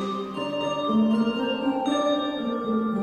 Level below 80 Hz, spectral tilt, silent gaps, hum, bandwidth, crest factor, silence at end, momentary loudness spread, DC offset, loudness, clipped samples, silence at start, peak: -62 dBFS; -6 dB/octave; none; none; 9.2 kHz; 12 dB; 0 s; 6 LU; under 0.1%; -25 LUFS; under 0.1%; 0 s; -12 dBFS